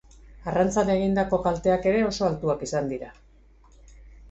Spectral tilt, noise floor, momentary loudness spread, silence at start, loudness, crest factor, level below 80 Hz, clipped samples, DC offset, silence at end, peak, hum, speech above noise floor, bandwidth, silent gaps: -6 dB/octave; -54 dBFS; 10 LU; 0.25 s; -24 LUFS; 16 dB; -46 dBFS; under 0.1%; under 0.1%; 0 s; -10 dBFS; none; 30 dB; 8.2 kHz; none